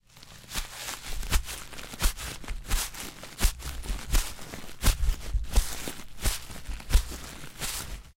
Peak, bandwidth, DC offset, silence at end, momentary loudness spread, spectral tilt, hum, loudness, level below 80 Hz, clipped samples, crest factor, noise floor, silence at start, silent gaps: -8 dBFS; 17 kHz; under 0.1%; 0.05 s; 11 LU; -2.5 dB/octave; none; -33 LUFS; -30 dBFS; under 0.1%; 22 dB; -49 dBFS; 0.15 s; none